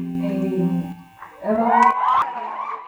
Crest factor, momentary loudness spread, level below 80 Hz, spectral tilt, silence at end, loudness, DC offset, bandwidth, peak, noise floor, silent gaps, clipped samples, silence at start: 18 dB; 14 LU; -58 dBFS; -7.5 dB/octave; 0 s; -20 LUFS; under 0.1%; over 20 kHz; -4 dBFS; -41 dBFS; none; under 0.1%; 0 s